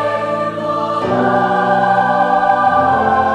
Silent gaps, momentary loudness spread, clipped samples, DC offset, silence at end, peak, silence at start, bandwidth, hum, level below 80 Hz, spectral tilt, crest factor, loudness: none; 6 LU; under 0.1%; under 0.1%; 0 s; -2 dBFS; 0 s; 9.4 kHz; none; -48 dBFS; -6.5 dB/octave; 12 dB; -14 LUFS